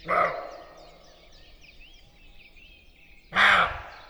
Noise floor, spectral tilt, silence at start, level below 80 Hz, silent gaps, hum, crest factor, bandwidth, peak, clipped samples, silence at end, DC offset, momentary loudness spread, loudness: -53 dBFS; -3 dB/octave; 0.05 s; -52 dBFS; none; none; 22 dB; over 20 kHz; -6 dBFS; under 0.1%; 0.1 s; under 0.1%; 23 LU; -22 LUFS